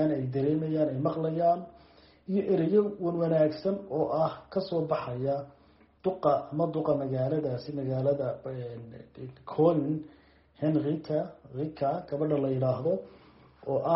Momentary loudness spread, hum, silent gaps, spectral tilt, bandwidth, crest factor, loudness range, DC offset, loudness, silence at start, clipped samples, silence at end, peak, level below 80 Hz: 13 LU; none; none; -8.5 dB/octave; 5.8 kHz; 18 dB; 3 LU; under 0.1%; -30 LUFS; 0 s; under 0.1%; 0 s; -12 dBFS; -64 dBFS